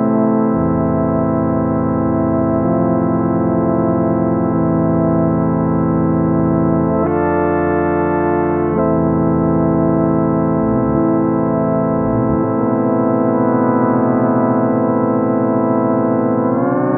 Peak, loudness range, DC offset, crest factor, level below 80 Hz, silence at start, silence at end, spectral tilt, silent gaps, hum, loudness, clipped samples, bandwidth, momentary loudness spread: -2 dBFS; 1 LU; under 0.1%; 12 dB; -38 dBFS; 0 s; 0 s; -14.5 dB/octave; none; none; -15 LUFS; under 0.1%; 2.8 kHz; 2 LU